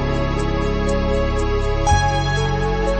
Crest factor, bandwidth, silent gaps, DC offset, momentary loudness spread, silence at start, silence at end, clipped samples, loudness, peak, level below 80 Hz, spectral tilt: 14 dB; 8.8 kHz; none; under 0.1%; 4 LU; 0 s; 0 s; under 0.1%; -20 LUFS; -4 dBFS; -22 dBFS; -5.5 dB/octave